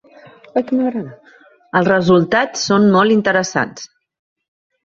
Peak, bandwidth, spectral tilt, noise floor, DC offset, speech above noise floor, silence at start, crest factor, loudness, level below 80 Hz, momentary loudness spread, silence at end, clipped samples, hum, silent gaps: -2 dBFS; 7.6 kHz; -5 dB/octave; -48 dBFS; under 0.1%; 33 dB; 0.55 s; 16 dB; -15 LUFS; -56 dBFS; 14 LU; 1 s; under 0.1%; none; none